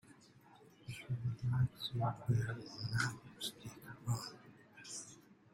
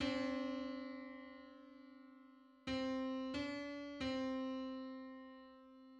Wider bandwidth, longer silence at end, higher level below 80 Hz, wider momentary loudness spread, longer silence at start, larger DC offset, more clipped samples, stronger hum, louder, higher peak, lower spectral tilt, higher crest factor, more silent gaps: first, 16.5 kHz vs 9 kHz; first, 0.2 s vs 0 s; about the same, -66 dBFS vs -70 dBFS; about the same, 18 LU vs 19 LU; about the same, 0.05 s vs 0 s; neither; neither; neither; first, -41 LUFS vs -44 LUFS; first, -22 dBFS vs -28 dBFS; about the same, -5 dB/octave vs -5 dB/octave; about the same, 18 dB vs 18 dB; neither